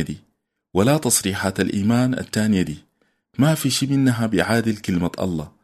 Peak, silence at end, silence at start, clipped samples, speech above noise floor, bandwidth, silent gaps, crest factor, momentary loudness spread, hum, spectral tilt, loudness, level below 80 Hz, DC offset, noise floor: -2 dBFS; 0.15 s; 0 s; under 0.1%; 45 dB; 13.5 kHz; none; 18 dB; 8 LU; none; -5 dB/octave; -20 LUFS; -50 dBFS; under 0.1%; -65 dBFS